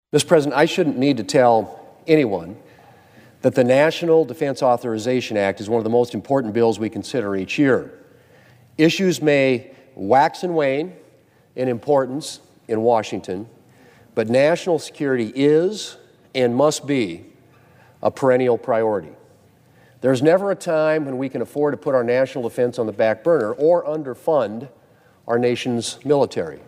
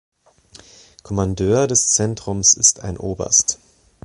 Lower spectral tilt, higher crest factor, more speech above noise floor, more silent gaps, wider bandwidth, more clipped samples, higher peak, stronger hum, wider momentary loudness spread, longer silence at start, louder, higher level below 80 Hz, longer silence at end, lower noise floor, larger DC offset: first, -5.5 dB/octave vs -3 dB/octave; about the same, 20 dB vs 20 dB; first, 35 dB vs 30 dB; neither; first, 15.5 kHz vs 11.5 kHz; neither; about the same, 0 dBFS vs 0 dBFS; neither; second, 11 LU vs 14 LU; second, 0.15 s vs 1.05 s; second, -19 LUFS vs -16 LUFS; second, -66 dBFS vs -42 dBFS; second, 0.1 s vs 0.5 s; first, -54 dBFS vs -48 dBFS; neither